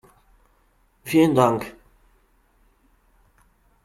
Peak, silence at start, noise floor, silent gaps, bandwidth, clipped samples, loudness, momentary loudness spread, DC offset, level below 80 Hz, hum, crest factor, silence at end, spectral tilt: -4 dBFS; 1.05 s; -62 dBFS; none; 14.5 kHz; under 0.1%; -20 LUFS; 22 LU; under 0.1%; -58 dBFS; none; 22 dB; 2.15 s; -6.5 dB/octave